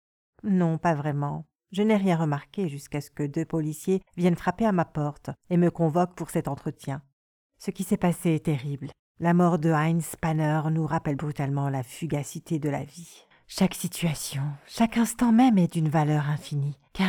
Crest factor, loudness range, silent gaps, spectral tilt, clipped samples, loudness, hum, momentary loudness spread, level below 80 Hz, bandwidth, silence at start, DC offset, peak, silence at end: 16 dB; 5 LU; 7.13-7.50 s, 8.99-9.15 s; -6.5 dB/octave; under 0.1%; -26 LUFS; none; 12 LU; -56 dBFS; 18.5 kHz; 0.45 s; under 0.1%; -10 dBFS; 0 s